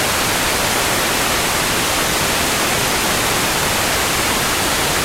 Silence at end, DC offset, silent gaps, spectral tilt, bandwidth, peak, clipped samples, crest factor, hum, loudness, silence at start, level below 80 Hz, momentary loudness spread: 0 s; under 0.1%; none; -2 dB/octave; 16 kHz; -4 dBFS; under 0.1%; 14 dB; none; -15 LUFS; 0 s; -34 dBFS; 0 LU